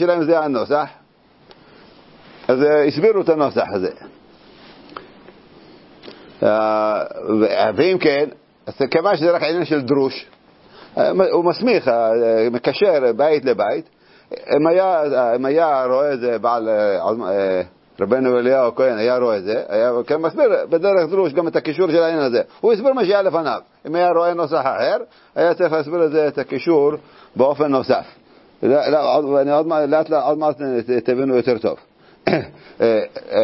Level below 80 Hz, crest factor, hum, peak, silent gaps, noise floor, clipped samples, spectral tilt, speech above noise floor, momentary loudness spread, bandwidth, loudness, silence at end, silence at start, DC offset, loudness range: -62 dBFS; 18 dB; none; 0 dBFS; none; -52 dBFS; under 0.1%; -10 dB/octave; 35 dB; 8 LU; 5.8 kHz; -18 LUFS; 0 s; 0 s; under 0.1%; 3 LU